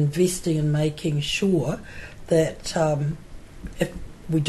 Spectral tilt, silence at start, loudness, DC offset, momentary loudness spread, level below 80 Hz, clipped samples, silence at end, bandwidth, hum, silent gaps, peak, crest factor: -5.5 dB/octave; 0 s; -24 LUFS; under 0.1%; 18 LU; -42 dBFS; under 0.1%; 0 s; 12.5 kHz; none; none; -8 dBFS; 16 dB